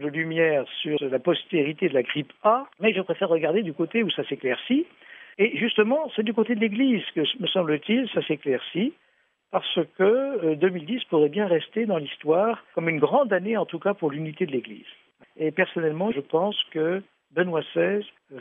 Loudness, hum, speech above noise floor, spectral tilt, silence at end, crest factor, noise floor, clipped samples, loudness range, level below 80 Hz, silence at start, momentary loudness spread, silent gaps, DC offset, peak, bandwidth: -25 LUFS; none; 38 dB; -8.5 dB/octave; 0 s; 20 dB; -62 dBFS; under 0.1%; 3 LU; -78 dBFS; 0 s; 7 LU; none; under 0.1%; -6 dBFS; 3.9 kHz